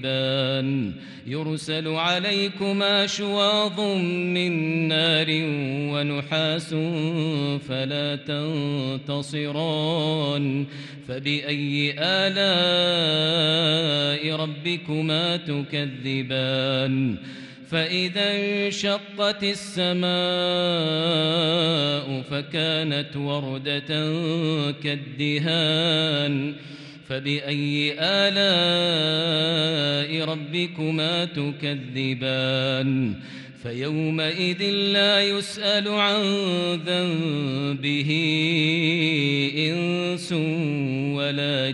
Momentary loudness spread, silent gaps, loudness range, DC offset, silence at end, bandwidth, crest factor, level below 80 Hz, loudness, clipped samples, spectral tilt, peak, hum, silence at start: 8 LU; none; 4 LU; under 0.1%; 0 s; 11.5 kHz; 16 dB; -66 dBFS; -23 LUFS; under 0.1%; -5.5 dB/octave; -8 dBFS; none; 0 s